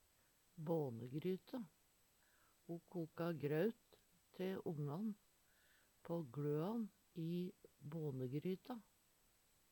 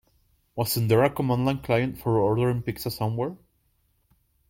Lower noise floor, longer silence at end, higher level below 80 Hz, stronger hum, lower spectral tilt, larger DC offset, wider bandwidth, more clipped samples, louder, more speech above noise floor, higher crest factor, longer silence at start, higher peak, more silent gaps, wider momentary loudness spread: first, -76 dBFS vs -68 dBFS; second, 0.9 s vs 1.15 s; second, -84 dBFS vs -52 dBFS; neither; first, -8 dB/octave vs -6.5 dB/octave; neither; first, 19 kHz vs 16.5 kHz; neither; second, -46 LUFS vs -25 LUFS; second, 31 dB vs 44 dB; about the same, 20 dB vs 18 dB; about the same, 0.55 s vs 0.55 s; second, -28 dBFS vs -8 dBFS; neither; first, 16 LU vs 9 LU